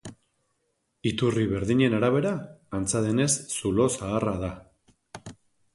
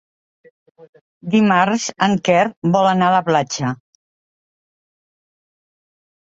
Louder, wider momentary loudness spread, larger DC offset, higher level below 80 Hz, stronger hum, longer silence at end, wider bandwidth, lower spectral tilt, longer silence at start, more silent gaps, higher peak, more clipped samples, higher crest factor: second, -26 LUFS vs -16 LUFS; first, 20 LU vs 9 LU; neither; first, -50 dBFS vs -60 dBFS; neither; second, 0.4 s vs 2.55 s; first, 11.5 kHz vs 8 kHz; about the same, -5 dB/octave vs -5 dB/octave; second, 0.05 s vs 0.8 s; second, none vs 0.89-0.93 s, 1.01-1.21 s, 2.57-2.62 s; second, -10 dBFS vs -2 dBFS; neither; about the same, 18 dB vs 18 dB